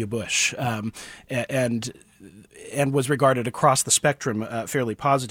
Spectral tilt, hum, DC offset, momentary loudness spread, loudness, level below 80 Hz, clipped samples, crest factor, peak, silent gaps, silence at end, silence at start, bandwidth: -3.5 dB/octave; none; under 0.1%; 11 LU; -23 LUFS; -60 dBFS; under 0.1%; 20 dB; -4 dBFS; none; 0 s; 0 s; 17 kHz